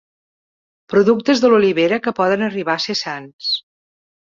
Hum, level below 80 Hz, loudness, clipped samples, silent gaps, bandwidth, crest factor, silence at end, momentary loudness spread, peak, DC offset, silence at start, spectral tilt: none; -60 dBFS; -17 LUFS; under 0.1%; 3.33-3.39 s; 7.6 kHz; 16 dB; 0.7 s; 9 LU; -2 dBFS; under 0.1%; 0.9 s; -5 dB/octave